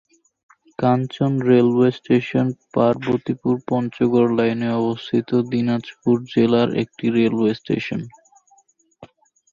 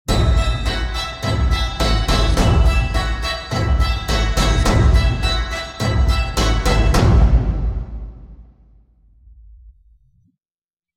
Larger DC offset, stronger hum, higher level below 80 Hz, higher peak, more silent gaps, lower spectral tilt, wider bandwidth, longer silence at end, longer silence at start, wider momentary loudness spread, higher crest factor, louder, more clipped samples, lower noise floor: neither; neither; second, -58 dBFS vs -20 dBFS; about the same, -4 dBFS vs -2 dBFS; neither; first, -8.5 dB/octave vs -5 dB/octave; second, 7.2 kHz vs 14.5 kHz; second, 0.45 s vs 1.25 s; first, 0.8 s vs 0.1 s; about the same, 7 LU vs 8 LU; about the same, 16 dB vs 16 dB; about the same, -20 LUFS vs -18 LUFS; neither; second, -58 dBFS vs under -90 dBFS